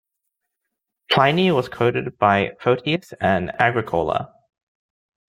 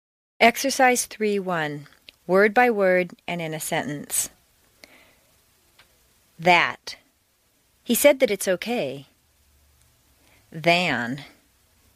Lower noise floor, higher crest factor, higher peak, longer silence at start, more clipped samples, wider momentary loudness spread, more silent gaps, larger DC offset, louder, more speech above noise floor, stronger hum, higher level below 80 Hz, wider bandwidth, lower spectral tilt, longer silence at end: first, -80 dBFS vs -65 dBFS; about the same, 20 dB vs 24 dB; about the same, -2 dBFS vs -2 dBFS; first, 1.1 s vs 0.4 s; neither; second, 7 LU vs 18 LU; neither; neither; about the same, -20 LUFS vs -22 LUFS; first, 61 dB vs 44 dB; neither; first, -56 dBFS vs -64 dBFS; about the same, 16 kHz vs 15.5 kHz; first, -6.5 dB/octave vs -3 dB/octave; first, 1 s vs 0.7 s